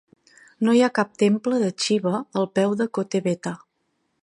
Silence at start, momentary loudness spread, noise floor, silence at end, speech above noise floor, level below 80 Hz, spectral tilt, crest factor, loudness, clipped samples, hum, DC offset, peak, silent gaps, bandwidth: 0.6 s; 8 LU; -72 dBFS; 0.65 s; 51 dB; -72 dBFS; -5.5 dB/octave; 18 dB; -22 LUFS; under 0.1%; none; under 0.1%; -4 dBFS; none; 11 kHz